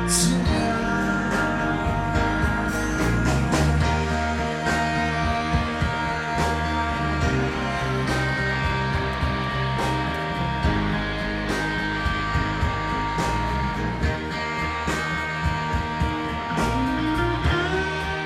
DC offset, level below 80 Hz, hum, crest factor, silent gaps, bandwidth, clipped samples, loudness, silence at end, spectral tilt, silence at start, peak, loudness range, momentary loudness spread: under 0.1%; -32 dBFS; none; 14 dB; none; 15.5 kHz; under 0.1%; -24 LUFS; 0 s; -5 dB/octave; 0 s; -8 dBFS; 2 LU; 4 LU